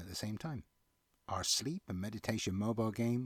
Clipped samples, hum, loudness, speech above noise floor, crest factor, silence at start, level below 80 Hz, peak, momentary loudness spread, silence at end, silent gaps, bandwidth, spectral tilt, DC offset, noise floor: under 0.1%; none; -38 LUFS; 40 dB; 18 dB; 0 s; -66 dBFS; -20 dBFS; 11 LU; 0 s; none; 18 kHz; -4 dB/octave; under 0.1%; -77 dBFS